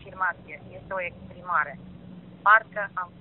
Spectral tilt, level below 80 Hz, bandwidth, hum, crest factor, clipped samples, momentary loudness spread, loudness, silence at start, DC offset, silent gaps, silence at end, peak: -2 dB/octave; -60 dBFS; 4 kHz; none; 24 dB; under 0.1%; 25 LU; -25 LUFS; 0 s; under 0.1%; none; 0.15 s; -4 dBFS